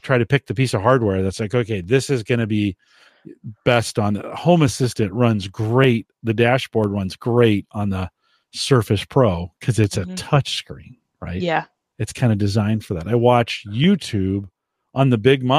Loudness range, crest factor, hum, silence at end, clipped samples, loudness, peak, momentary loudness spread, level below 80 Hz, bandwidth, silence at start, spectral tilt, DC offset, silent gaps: 3 LU; 18 dB; none; 0 s; under 0.1%; -19 LUFS; -2 dBFS; 10 LU; -48 dBFS; 15 kHz; 0.05 s; -6 dB/octave; under 0.1%; none